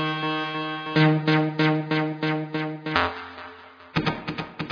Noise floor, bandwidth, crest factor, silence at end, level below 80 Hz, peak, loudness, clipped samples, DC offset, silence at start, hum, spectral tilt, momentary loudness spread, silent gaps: -45 dBFS; 5.4 kHz; 24 dB; 0 s; -56 dBFS; -2 dBFS; -25 LUFS; under 0.1%; under 0.1%; 0 s; none; -7.5 dB/octave; 12 LU; none